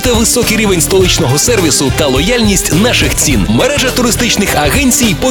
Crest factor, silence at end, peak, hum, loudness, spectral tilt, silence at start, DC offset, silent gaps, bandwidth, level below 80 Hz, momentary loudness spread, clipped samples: 10 dB; 0 s; 0 dBFS; none; -9 LUFS; -3.5 dB/octave; 0 s; 0.4%; none; over 20 kHz; -22 dBFS; 2 LU; under 0.1%